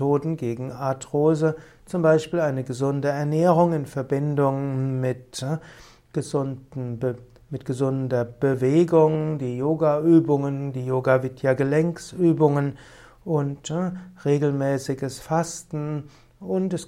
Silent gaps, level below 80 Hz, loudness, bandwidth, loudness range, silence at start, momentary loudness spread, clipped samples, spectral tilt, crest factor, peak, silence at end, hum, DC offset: none; -58 dBFS; -23 LUFS; 13.5 kHz; 6 LU; 0 s; 12 LU; under 0.1%; -7.5 dB/octave; 18 dB; -6 dBFS; 0 s; none; under 0.1%